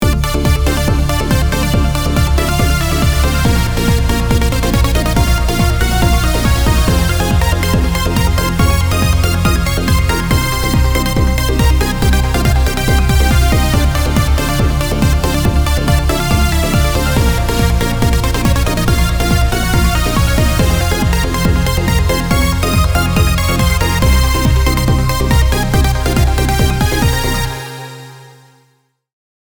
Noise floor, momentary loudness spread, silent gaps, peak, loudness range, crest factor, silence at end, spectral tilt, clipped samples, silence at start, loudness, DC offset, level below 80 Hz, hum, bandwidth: -58 dBFS; 2 LU; none; 0 dBFS; 1 LU; 12 dB; 1.15 s; -5 dB/octave; under 0.1%; 0 s; -13 LUFS; 1%; -16 dBFS; none; over 20 kHz